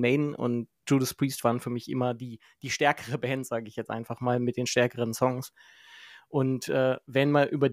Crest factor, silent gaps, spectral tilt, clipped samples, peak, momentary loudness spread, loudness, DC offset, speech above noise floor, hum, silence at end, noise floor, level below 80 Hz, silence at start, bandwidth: 20 dB; none; -5.5 dB/octave; under 0.1%; -8 dBFS; 10 LU; -28 LUFS; under 0.1%; 23 dB; none; 0 s; -51 dBFS; -70 dBFS; 0 s; 16 kHz